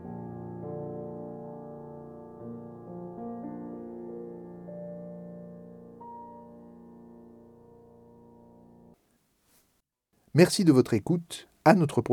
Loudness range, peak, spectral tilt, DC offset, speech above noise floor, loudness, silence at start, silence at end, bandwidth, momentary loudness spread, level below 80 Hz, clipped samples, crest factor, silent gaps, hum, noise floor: 23 LU; -4 dBFS; -6 dB/octave; under 0.1%; 52 dB; -28 LUFS; 0 s; 0 s; 17.5 kHz; 26 LU; -70 dBFS; under 0.1%; 26 dB; none; none; -74 dBFS